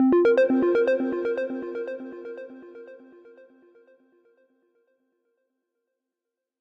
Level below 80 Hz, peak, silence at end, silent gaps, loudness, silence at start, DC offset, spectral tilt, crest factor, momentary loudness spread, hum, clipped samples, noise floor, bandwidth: -70 dBFS; -14 dBFS; 3.65 s; none; -23 LUFS; 0 s; under 0.1%; -7 dB/octave; 14 dB; 25 LU; none; under 0.1%; -86 dBFS; 6 kHz